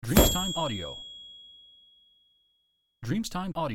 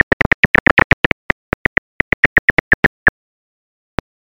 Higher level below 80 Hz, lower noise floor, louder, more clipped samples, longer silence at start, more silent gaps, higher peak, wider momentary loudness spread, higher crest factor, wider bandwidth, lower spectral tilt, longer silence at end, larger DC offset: second, -38 dBFS vs -32 dBFS; second, -75 dBFS vs under -90 dBFS; second, -28 LUFS vs -13 LUFS; neither; second, 0.05 s vs 0.45 s; second, none vs 0.46-0.54 s, 0.60-0.77 s, 0.84-3.06 s; second, -6 dBFS vs 0 dBFS; first, 24 LU vs 8 LU; first, 24 dB vs 16 dB; first, 17 kHz vs 12 kHz; second, -4 dB/octave vs -6.5 dB/octave; second, 0 s vs 1.15 s; neither